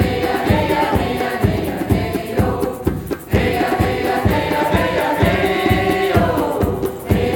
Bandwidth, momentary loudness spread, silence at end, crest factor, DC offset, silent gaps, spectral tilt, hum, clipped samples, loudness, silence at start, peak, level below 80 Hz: over 20 kHz; 5 LU; 0 s; 16 dB; under 0.1%; none; -6.5 dB/octave; none; under 0.1%; -18 LUFS; 0 s; -2 dBFS; -30 dBFS